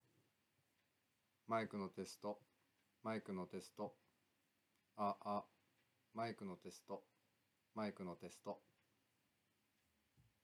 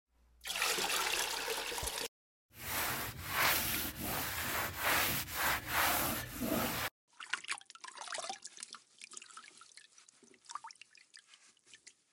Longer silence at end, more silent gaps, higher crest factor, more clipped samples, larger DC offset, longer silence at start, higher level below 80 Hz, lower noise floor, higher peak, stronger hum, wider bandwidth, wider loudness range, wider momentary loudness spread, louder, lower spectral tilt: first, 1.85 s vs 0.25 s; second, none vs 2.08-2.49 s, 6.91-7.08 s; about the same, 22 dB vs 22 dB; neither; neither; first, 1.5 s vs 0.45 s; second, under -90 dBFS vs -58 dBFS; first, -85 dBFS vs -64 dBFS; second, -30 dBFS vs -16 dBFS; neither; second, 14 kHz vs 17 kHz; second, 5 LU vs 16 LU; second, 12 LU vs 19 LU; second, -49 LUFS vs -35 LUFS; first, -6 dB/octave vs -1.5 dB/octave